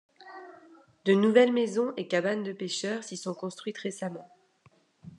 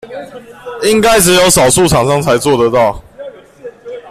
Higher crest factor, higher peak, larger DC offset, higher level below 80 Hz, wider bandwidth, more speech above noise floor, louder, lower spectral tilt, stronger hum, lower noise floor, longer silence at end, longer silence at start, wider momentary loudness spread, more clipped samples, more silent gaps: first, 22 dB vs 12 dB; second, -8 dBFS vs 0 dBFS; neither; second, -84 dBFS vs -34 dBFS; second, 11 kHz vs 16 kHz; first, 36 dB vs 22 dB; second, -28 LUFS vs -9 LUFS; first, -5 dB/octave vs -3.5 dB/octave; neither; first, -64 dBFS vs -32 dBFS; about the same, 0.1 s vs 0 s; first, 0.2 s vs 0.05 s; about the same, 24 LU vs 24 LU; neither; neither